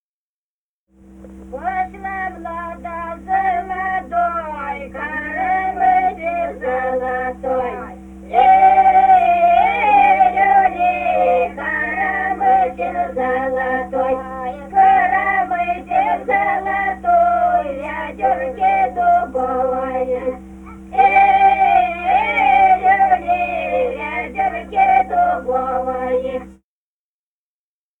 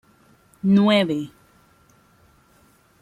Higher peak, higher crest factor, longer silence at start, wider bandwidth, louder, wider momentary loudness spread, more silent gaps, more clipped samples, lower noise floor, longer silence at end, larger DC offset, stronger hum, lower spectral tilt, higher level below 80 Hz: first, -2 dBFS vs -6 dBFS; about the same, 14 dB vs 18 dB; first, 1.15 s vs 0.65 s; second, 3.9 kHz vs 10.5 kHz; first, -16 LUFS vs -19 LUFS; about the same, 14 LU vs 13 LU; neither; neither; first, under -90 dBFS vs -57 dBFS; second, 1.45 s vs 1.75 s; neither; neither; about the same, -6 dB/octave vs -7 dB/octave; first, -42 dBFS vs -64 dBFS